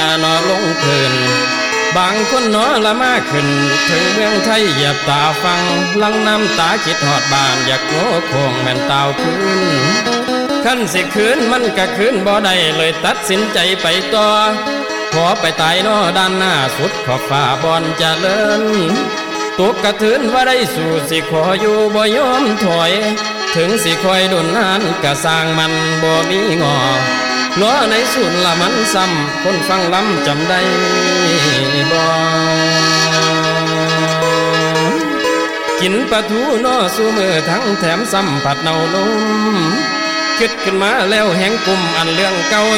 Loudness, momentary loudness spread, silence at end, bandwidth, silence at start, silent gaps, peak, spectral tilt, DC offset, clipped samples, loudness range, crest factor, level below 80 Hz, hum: -13 LUFS; 3 LU; 0 s; 17.5 kHz; 0 s; none; -2 dBFS; -3.5 dB/octave; under 0.1%; under 0.1%; 2 LU; 10 dB; -48 dBFS; none